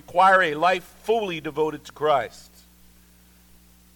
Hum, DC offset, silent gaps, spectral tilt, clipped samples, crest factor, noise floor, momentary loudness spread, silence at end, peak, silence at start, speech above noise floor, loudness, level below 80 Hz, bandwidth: 60 Hz at -55 dBFS; under 0.1%; none; -4.5 dB/octave; under 0.1%; 18 dB; -54 dBFS; 11 LU; 1.55 s; -6 dBFS; 0.1 s; 32 dB; -22 LUFS; -58 dBFS; 19 kHz